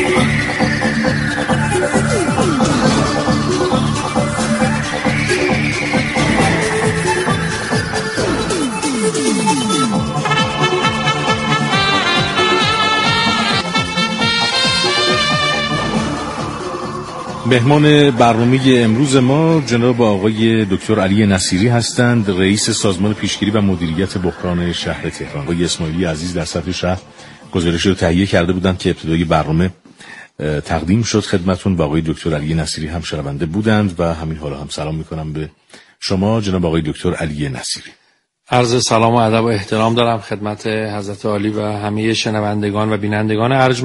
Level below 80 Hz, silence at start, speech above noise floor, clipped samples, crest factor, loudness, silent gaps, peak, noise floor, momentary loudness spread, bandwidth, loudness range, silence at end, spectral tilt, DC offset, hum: -38 dBFS; 0 s; 41 dB; under 0.1%; 16 dB; -15 LUFS; none; 0 dBFS; -56 dBFS; 9 LU; 11.5 kHz; 6 LU; 0 s; -5 dB/octave; under 0.1%; none